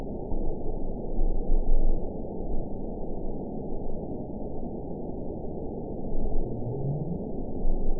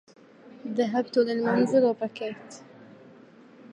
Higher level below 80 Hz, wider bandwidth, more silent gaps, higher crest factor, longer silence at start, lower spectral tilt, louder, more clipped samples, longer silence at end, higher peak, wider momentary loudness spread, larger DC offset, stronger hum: first, -28 dBFS vs -80 dBFS; second, 1 kHz vs 9.8 kHz; neither; about the same, 16 dB vs 18 dB; second, 0 s vs 0.45 s; first, -17 dB/octave vs -6 dB/octave; second, -35 LUFS vs -26 LUFS; neither; about the same, 0 s vs 0.05 s; about the same, -10 dBFS vs -10 dBFS; second, 5 LU vs 20 LU; first, 0.8% vs under 0.1%; neither